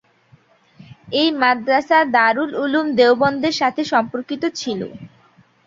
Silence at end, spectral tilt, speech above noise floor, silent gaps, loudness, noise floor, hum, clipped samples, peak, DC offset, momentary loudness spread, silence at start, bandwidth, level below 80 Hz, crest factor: 0.6 s; -4 dB/octave; 36 dB; none; -17 LUFS; -54 dBFS; none; under 0.1%; -2 dBFS; under 0.1%; 11 LU; 0.8 s; 7.6 kHz; -62 dBFS; 18 dB